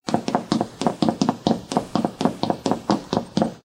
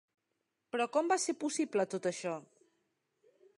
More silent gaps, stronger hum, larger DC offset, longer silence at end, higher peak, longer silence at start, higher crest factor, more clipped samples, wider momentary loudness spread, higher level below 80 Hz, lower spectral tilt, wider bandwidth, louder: neither; neither; neither; second, 0.05 s vs 1.15 s; first, -2 dBFS vs -18 dBFS; second, 0.05 s vs 0.75 s; about the same, 20 dB vs 20 dB; neither; second, 3 LU vs 10 LU; first, -54 dBFS vs -90 dBFS; first, -6 dB/octave vs -3.5 dB/octave; first, 15.5 kHz vs 11 kHz; first, -24 LUFS vs -34 LUFS